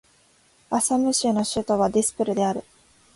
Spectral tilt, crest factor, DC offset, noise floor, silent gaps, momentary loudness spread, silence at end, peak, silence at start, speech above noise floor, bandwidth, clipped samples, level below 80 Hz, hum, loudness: -4 dB/octave; 14 dB; under 0.1%; -59 dBFS; none; 5 LU; 0.55 s; -10 dBFS; 0.7 s; 37 dB; 12 kHz; under 0.1%; -56 dBFS; none; -23 LUFS